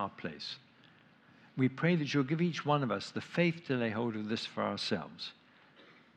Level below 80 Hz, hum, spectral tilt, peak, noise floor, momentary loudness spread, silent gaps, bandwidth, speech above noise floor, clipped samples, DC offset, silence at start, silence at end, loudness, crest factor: -82 dBFS; none; -6.5 dB/octave; -16 dBFS; -62 dBFS; 12 LU; none; 9.4 kHz; 29 dB; under 0.1%; under 0.1%; 0 s; 0.3 s; -34 LUFS; 20 dB